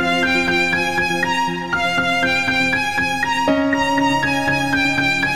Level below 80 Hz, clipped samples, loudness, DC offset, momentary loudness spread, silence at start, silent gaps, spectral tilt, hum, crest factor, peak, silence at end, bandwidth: -44 dBFS; under 0.1%; -17 LUFS; 1%; 3 LU; 0 s; none; -4 dB/octave; none; 14 dB; -4 dBFS; 0 s; 16 kHz